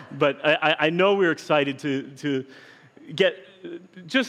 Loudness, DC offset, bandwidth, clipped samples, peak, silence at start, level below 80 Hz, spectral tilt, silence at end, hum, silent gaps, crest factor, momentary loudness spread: -23 LUFS; under 0.1%; 12 kHz; under 0.1%; -6 dBFS; 0 s; -78 dBFS; -5 dB/octave; 0 s; none; none; 18 dB; 20 LU